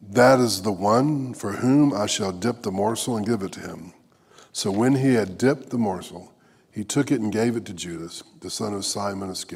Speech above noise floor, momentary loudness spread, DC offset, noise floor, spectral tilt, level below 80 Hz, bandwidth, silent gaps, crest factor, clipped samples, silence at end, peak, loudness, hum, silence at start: 31 dB; 16 LU; under 0.1%; -53 dBFS; -5 dB/octave; -64 dBFS; 16 kHz; none; 20 dB; under 0.1%; 0 s; -4 dBFS; -23 LUFS; none; 0 s